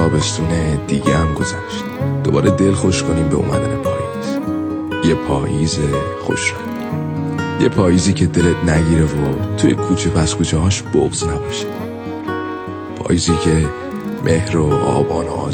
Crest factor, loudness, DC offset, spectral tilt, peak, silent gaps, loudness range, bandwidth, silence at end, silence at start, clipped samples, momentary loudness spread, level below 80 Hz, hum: 16 dB; -17 LUFS; under 0.1%; -5.5 dB/octave; 0 dBFS; none; 4 LU; 14 kHz; 0 s; 0 s; under 0.1%; 9 LU; -32 dBFS; none